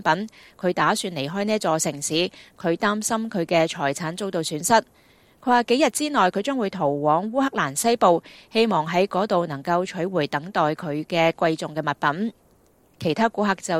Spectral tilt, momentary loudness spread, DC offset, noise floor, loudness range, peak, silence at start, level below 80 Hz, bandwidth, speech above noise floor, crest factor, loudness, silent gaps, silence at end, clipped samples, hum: -4 dB/octave; 7 LU; under 0.1%; -58 dBFS; 3 LU; -4 dBFS; 0 s; -64 dBFS; 16 kHz; 36 dB; 20 dB; -23 LUFS; none; 0 s; under 0.1%; none